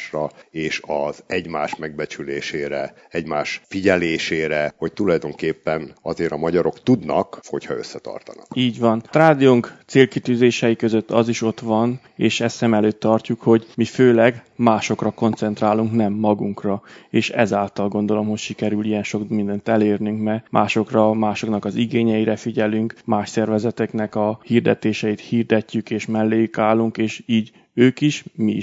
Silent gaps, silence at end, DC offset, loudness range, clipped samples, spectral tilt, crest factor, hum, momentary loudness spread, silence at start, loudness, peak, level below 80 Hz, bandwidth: none; 0 s; under 0.1%; 5 LU; under 0.1%; -6 dB/octave; 20 dB; none; 10 LU; 0 s; -20 LUFS; 0 dBFS; -58 dBFS; 7.8 kHz